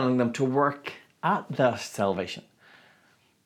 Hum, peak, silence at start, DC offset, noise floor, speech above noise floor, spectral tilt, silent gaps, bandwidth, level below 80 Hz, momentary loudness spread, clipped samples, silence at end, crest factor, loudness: none; -10 dBFS; 0 s; under 0.1%; -64 dBFS; 37 dB; -6 dB/octave; none; 14.5 kHz; -74 dBFS; 13 LU; under 0.1%; 1.05 s; 18 dB; -27 LUFS